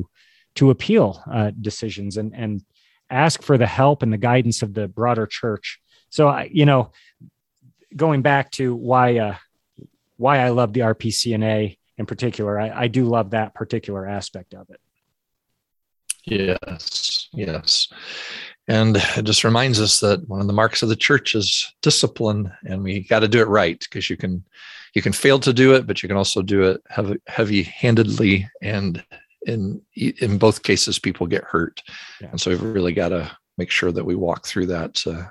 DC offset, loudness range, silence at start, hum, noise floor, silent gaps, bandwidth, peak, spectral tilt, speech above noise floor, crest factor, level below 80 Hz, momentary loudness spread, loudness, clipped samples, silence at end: under 0.1%; 6 LU; 0 s; none; -76 dBFS; none; 12.5 kHz; -2 dBFS; -4.5 dB/octave; 56 dB; 18 dB; -46 dBFS; 13 LU; -19 LUFS; under 0.1%; 0 s